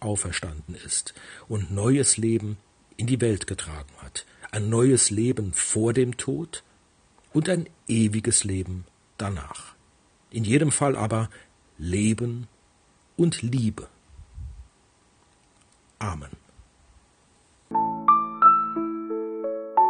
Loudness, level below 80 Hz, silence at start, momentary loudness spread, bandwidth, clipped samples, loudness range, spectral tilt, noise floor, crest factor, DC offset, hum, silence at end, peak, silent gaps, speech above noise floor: -24 LUFS; -52 dBFS; 0 s; 19 LU; 10.5 kHz; under 0.1%; 10 LU; -4.5 dB/octave; -61 dBFS; 20 dB; under 0.1%; none; 0 s; -6 dBFS; none; 36 dB